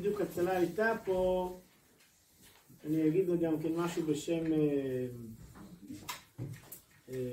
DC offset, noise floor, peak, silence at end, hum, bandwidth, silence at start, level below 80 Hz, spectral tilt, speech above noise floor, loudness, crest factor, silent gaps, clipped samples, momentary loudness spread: under 0.1%; -66 dBFS; -18 dBFS; 0 s; none; 16 kHz; 0 s; -62 dBFS; -6.5 dB/octave; 33 dB; -34 LUFS; 16 dB; none; under 0.1%; 19 LU